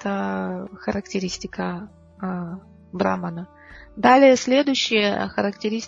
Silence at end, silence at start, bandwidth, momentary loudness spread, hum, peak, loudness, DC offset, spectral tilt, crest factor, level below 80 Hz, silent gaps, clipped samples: 0 s; 0 s; 7.8 kHz; 21 LU; none; -2 dBFS; -21 LUFS; under 0.1%; -4.5 dB/octave; 20 dB; -54 dBFS; none; under 0.1%